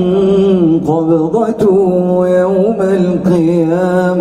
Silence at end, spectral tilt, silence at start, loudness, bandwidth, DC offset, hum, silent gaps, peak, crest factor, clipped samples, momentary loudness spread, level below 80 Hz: 0 s; -8.5 dB/octave; 0 s; -11 LUFS; 11 kHz; under 0.1%; none; none; 0 dBFS; 10 dB; under 0.1%; 2 LU; -44 dBFS